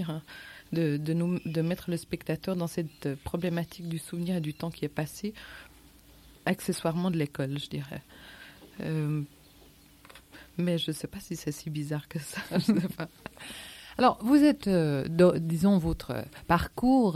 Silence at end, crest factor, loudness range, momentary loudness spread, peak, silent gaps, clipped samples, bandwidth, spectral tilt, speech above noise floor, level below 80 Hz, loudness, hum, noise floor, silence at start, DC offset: 0 s; 20 dB; 9 LU; 19 LU; -10 dBFS; none; under 0.1%; 16 kHz; -6.5 dB/octave; 27 dB; -52 dBFS; -29 LUFS; none; -56 dBFS; 0 s; under 0.1%